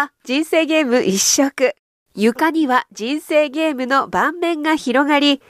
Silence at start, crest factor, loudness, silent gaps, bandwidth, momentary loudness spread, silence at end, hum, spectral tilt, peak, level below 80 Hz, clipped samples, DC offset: 0 s; 14 dB; -17 LUFS; 1.79-2.06 s; 15.5 kHz; 6 LU; 0.15 s; none; -2.5 dB/octave; -4 dBFS; -60 dBFS; under 0.1%; under 0.1%